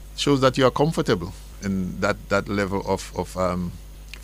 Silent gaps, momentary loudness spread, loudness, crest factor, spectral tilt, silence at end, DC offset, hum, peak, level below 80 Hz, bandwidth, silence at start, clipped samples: none; 14 LU; -23 LUFS; 20 dB; -5.5 dB/octave; 0 s; under 0.1%; none; -4 dBFS; -40 dBFS; 16 kHz; 0 s; under 0.1%